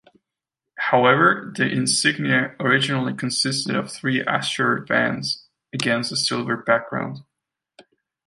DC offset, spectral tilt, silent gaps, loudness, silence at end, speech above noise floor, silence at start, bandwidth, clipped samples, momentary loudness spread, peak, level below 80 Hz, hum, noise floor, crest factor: under 0.1%; -3.5 dB/octave; none; -21 LUFS; 1.05 s; 64 dB; 0.75 s; 11.5 kHz; under 0.1%; 10 LU; -2 dBFS; -66 dBFS; none; -85 dBFS; 20 dB